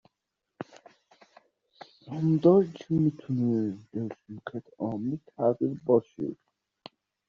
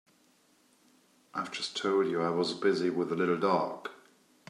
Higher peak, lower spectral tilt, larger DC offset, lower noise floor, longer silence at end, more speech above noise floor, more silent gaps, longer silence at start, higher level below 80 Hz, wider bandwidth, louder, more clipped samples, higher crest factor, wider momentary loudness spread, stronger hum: first, -8 dBFS vs -14 dBFS; first, -9.5 dB/octave vs -5 dB/octave; neither; first, -84 dBFS vs -67 dBFS; first, 0.95 s vs 0.55 s; first, 57 dB vs 37 dB; neither; second, 0.6 s vs 1.35 s; first, -68 dBFS vs -82 dBFS; second, 7 kHz vs 11 kHz; about the same, -28 LUFS vs -30 LUFS; neither; about the same, 22 dB vs 18 dB; first, 18 LU vs 11 LU; neither